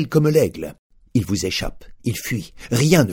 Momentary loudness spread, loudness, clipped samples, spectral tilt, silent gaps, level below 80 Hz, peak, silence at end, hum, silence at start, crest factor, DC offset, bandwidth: 14 LU; -21 LUFS; under 0.1%; -5.5 dB/octave; 0.79-0.90 s; -40 dBFS; 0 dBFS; 0 s; none; 0 s; 20 dB; under 0.1%; 19.5 kHz